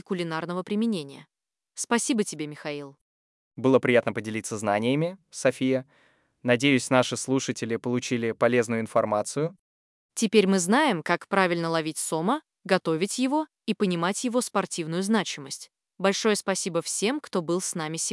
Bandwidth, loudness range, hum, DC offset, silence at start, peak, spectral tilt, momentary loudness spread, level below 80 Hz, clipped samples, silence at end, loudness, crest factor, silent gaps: 12 kHz; 3 LU; none; under 0.1%; 0.1 s; -6 dBFS; -4 dB/octave; 10 LU; -80 dBFS; under 0.1%; 0 s; -26 LUFS; 20 dB; 3.01-3.51 s, 9.59-10.09 s